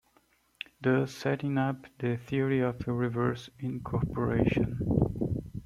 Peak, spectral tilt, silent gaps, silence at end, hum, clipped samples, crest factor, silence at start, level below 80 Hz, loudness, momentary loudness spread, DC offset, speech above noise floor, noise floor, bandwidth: -12 dBFS; -8 dB/octave; none; 0 s; none; under 0.1%; 18 dB; 0.8 s; -48 dBFS; -30 LUFS; 7 LU; under 0.1%; 38 dB; -68 dBFS; 12.5 kHz